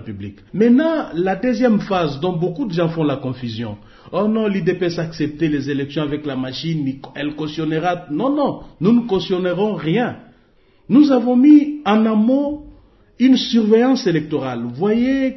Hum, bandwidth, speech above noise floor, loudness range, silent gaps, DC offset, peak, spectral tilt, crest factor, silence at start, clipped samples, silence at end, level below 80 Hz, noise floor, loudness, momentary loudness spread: none; 6.2 kHz; 36 dB; 7 LU; none; under 0.1%; -2 dBFS; -7.5 dB/octave; 16 dB; 0 s; under 0.1%; 0 s; -50 dBFS; -53 dBFS; -18 LUFS; 12 LU